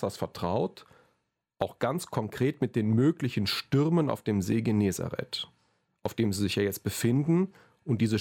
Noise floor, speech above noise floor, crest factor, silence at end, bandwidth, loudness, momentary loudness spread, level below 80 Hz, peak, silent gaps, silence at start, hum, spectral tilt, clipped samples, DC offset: -77 dBFS; 49 dB; 18 dB; 0 s; 17 kHz; -29 LUFS; 10 LU; -62 dBFS; -12 dBFS; none; 0 s; none; -6 dB/octave; under 0.1%; under 0.1%